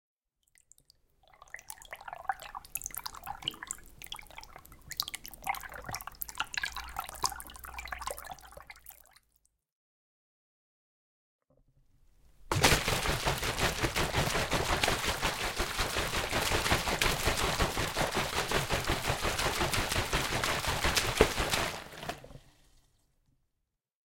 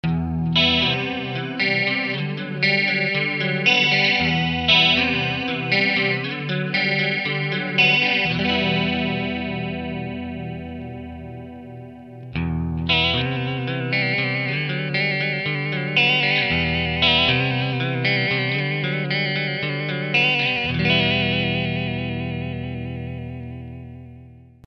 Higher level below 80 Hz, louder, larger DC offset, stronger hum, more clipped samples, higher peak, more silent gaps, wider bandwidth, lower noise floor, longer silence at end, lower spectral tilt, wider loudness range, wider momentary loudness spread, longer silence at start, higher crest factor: about the same, -44 dBFS vs -44 dBFS; second, -32 LUFS vs -20 LUFS; neither; neither; neither; second, -6 dBFS vs -2 dBFS; first, 9.72-11.39 s vs none; first, 17 kHz vs 6.6 kHz; first, -84 dBFS vs -44 dBFS; first, 1.75 s vs 0.3 s; second, -3 dB/octave vs -6 dB/octave; first, 12 LU vs 8 LU; about the same, 16 LU vs 16 LU; first, 1.55 s vs 0.05 s; first, 28 dB vs 20 dB